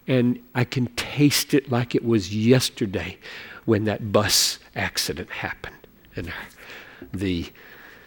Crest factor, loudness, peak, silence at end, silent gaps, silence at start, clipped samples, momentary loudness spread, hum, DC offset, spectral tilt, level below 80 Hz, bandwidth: 20 dB; -23 LUFS; -4 dBFS; 0.15 s; none; 0.05 s; under 0.1%; 19 LU; none; under 0.1%; -4.5 dB/octave; -52 dBFS; 19 kHz